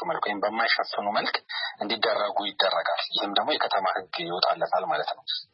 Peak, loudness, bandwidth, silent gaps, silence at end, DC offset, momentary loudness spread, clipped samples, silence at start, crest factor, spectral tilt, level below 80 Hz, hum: -6 dBFS; -26 LUFS; 5.8 kHz; none; 0.1 s; under 0.1%; 6 LU; under 0.1%; 0 s; 20 dB; -7 dB/octave; -82 dBFS; none